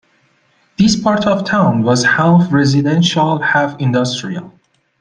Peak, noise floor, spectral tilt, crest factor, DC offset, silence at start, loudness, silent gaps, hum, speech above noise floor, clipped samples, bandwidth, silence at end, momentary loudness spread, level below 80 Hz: -2 dBFS; -57 dBFS; -5.5 dB/octave; 12 dB; under 0.1%; 0.8 s; -13 LUFS; none; none; 44 dB; under 0.1%; 9.6 kHz; 0.5 s; 8 LU; -48 dBFS